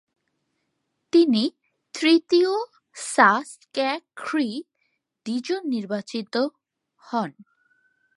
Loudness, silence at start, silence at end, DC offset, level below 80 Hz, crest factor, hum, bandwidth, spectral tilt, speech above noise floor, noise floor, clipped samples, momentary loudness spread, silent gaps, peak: -23 LUFS; 1.15 s; 0.85 s; under 0.1%; -82 dBFS; 22 dB; none; 11.5 kHz; -4 dB/octave; 54 dB; -76 dBFS; under 0.1%; 15 LU; none; -2 dBFS